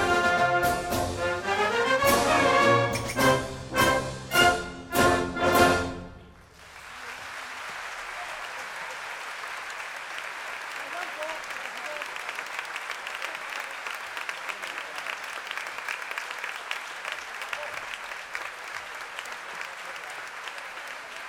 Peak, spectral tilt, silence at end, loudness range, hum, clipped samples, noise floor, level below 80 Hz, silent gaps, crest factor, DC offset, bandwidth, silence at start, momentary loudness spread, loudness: -6 dBFS; -3.5 dB/octave; 0 s; 12 LU; none; under 0.1%; -50 dBFS; -50 dBFS; none; 22 dB; under 0.1%; over 20 kHz; 0 s; 15 LU; -28 LUFS